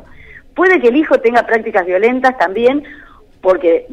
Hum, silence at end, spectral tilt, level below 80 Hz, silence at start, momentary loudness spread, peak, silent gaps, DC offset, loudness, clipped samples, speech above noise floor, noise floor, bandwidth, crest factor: none; 0 s; -5.5 dB/octave; -46 dBFS; 0.35 s; 5 LU; -2 dBFS; none; under 0.1%; -13 LUFS; under 0.1%; 26 dB; -38 dBFS; 9 kHz; 12 dB